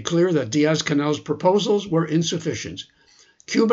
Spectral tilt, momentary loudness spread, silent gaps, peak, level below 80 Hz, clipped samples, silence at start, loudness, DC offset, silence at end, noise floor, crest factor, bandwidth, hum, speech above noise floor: -5 dB/octave; 11 LU; none; -4 dBFS; -60 dBFS; under 0.1%; 0 s; -21 LUFS; under 0.1%; 0 s; -55 dBFS; 18 dB; 8 kHz; none; 34 dB